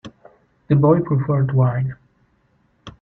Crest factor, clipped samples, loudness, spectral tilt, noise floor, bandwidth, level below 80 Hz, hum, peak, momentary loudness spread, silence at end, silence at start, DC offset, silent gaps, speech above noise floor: 18 dB; under 0.1%; -18 LUFS; -11 dB/octave; -62 dBFS; 4.1 kHz; -52 dBFS; none; -2 dBFS; 8 LU; 0.1 s; 0.05 s; under 0.1%; none; 45 dB